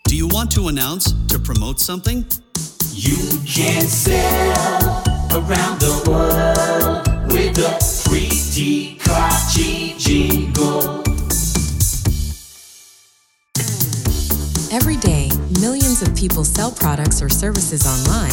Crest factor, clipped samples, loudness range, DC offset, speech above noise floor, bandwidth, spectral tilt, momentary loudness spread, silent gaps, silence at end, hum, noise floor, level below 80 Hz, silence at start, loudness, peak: 16 dB; under 0.1%; 4 LU; under 0.1%; 41 dB; 19 kHz; -4 dB/octave; 5 LU; none; 0 s; none; -57 dBFS; -24 dBFS; 0.05 s; -17 LUFS; -2 dBFS